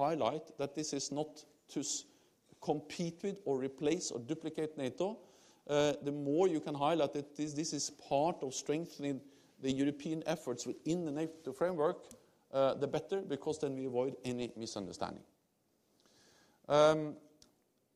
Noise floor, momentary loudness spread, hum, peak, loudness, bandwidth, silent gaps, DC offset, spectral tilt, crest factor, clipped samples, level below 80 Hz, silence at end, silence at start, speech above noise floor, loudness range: -77 dBFS; 9 LU; none; -14 dBFS; -37 LUFS; 14 kHz; none; under 0.1%; -4.5 dB/octave; 22 dB; under 0.1%; -74 dBFS; 0.75 s; 0 s; 41 dB; 4 LU